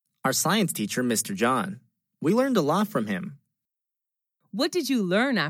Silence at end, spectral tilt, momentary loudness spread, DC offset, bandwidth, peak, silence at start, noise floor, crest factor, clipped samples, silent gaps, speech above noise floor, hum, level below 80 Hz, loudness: 0 s; -4 dB/octave; 10 LU; under 0.1%; 17 kHz; -10 dBFS; 0.25 s; -87 dBFS; 16 dB; under 0.1%; none; 63 dB; none; -82 dBFS; -25 LUFS